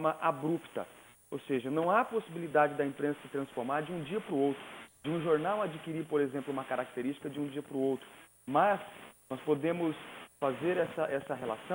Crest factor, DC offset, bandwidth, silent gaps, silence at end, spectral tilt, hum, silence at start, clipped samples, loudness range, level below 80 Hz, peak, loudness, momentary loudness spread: 20 dB; under 0.1%; over 20 kHz; none; 0 s; -6.5 dB/octave; none; 0 s; under 0.1%; 2 LU; -74 dBFS; -14 dBFS; -34 LUFS; 13 LU